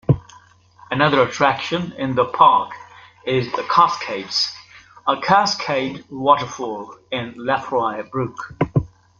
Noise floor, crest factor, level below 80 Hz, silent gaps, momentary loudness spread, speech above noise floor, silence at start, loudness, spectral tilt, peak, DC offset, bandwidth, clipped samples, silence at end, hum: -49 dBFS; 18 dB; -48 dBFS; none; 12 LU; 30 dB; 0.1 s; -19 LUFS; -5 dB/octave; -2 dBFS; under 0.1%; 7.4 kHz; under 0.1%; 0.3 s; 50 Hz at -55 dBFS